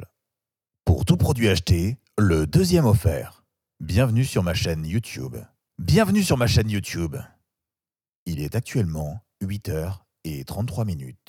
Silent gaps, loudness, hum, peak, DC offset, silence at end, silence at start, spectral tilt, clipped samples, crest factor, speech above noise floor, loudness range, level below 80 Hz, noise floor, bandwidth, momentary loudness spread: 8.15-8.26 s; -23 LUFS; none; -4 dBFS; under 0.1%; 0.15 s; 0 s; -6 dB/octave; under 0.1%; 18 dB; over 68 dB; 8 LU; -38 dBFS; under -90 dBFS; 17 kHz; 15 LU